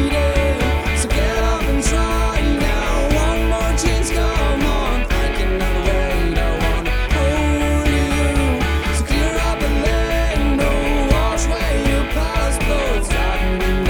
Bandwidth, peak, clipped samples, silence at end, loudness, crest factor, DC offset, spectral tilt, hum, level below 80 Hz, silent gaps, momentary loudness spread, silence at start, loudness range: 19 kHz; -2 dBFS; under 0.1%; 0 s; -18 LUFS; 14 dB; under 0.1%; -5 dB/octave; none; -18 dBFS; none; 2 LU; 0 s; 1 LU